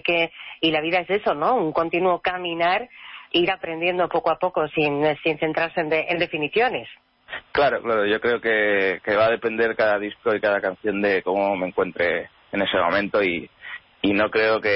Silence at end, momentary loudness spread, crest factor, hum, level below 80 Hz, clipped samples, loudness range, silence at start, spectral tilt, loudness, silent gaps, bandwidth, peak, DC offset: 0 s; 6 LU; 14 dB; none; -58 dBFS; under 0.1%; 2 LU; 0.05 s; -9.5 dB/octave; -22 LUFS; none; 5.8 kHz; -10 dBFS; under 0.1%